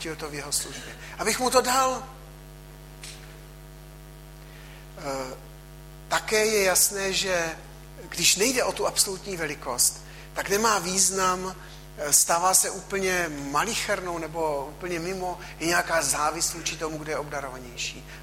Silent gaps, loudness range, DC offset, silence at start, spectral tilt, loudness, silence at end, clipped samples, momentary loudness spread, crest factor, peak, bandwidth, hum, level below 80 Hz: none; 12 LU; under 0.1%; 0 s; -1.5 dB/octave; -24 LUFS; 0 s; under 0.1%; 22 LU; 22 dB; -6 dBFS; 16 kHz; none; -48 dBFS